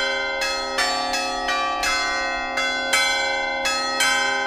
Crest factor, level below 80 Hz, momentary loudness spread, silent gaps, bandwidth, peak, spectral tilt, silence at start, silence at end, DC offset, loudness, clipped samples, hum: 18 dB; -48 dBFS; 4 LU; none; 16.5 kHz; -6 dBFS; 0 dB/octave; 0 s; 0 s; under 0.1%; -21 LUFS; under 0.1%; none